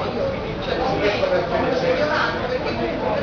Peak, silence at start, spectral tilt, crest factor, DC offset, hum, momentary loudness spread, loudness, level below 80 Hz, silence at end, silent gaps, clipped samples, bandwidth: -8 dBFS; 0 s; -6 dB/octave; 14 dB; under 0.1%; none; 5 LU; -21 LUFS; -40 dBFS; 0 s; none; under 0.1%; 5.4 kHz